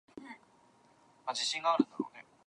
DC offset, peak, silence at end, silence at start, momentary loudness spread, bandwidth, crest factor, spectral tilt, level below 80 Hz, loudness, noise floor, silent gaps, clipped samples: under 0.1%; -12 dBFS; 0.25 s; 0.15 s; 21 LU; 10.5 kHz; 24 dB; -2.5 dB/octave; -86 dBFS; -34 LUFS; -65 dBFS; none; under 0.1%